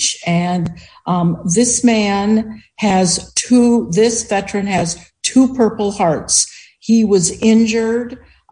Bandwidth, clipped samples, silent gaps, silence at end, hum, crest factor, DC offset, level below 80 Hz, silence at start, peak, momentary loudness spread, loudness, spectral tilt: 10.5 kHz; under 0.1%; none; 0.35 s; none; 14 dB; under 0.1%; -48 dBFS; 0 s; 0 dBFS; 9 LU; -15 LUFS; -4 dB/octave